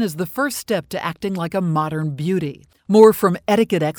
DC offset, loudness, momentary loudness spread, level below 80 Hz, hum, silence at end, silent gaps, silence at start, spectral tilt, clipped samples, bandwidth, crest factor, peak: under 0.1%; -18 LUFS; 13 LU; -56 dBFS; none; 0.05 s; none; 0 s; -6 dB/octave; under 0.1%; over 20 kHz; 18 dB; 0 dBFS